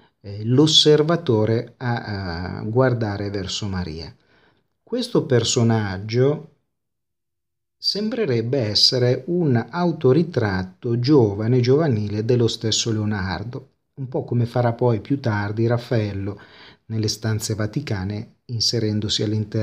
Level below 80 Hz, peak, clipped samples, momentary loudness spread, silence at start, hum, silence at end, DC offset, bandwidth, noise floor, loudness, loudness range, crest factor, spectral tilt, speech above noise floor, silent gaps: -54 dBFS; -2 dBFS; under 0.1%; 13 LU; 0.25 s; none; 0 s; under 0.1%; 13.5 kHz; -85 dBFS; -21 LUFS; 6 LU; 18 dB; -5.5 dB/octave; 64 dB; none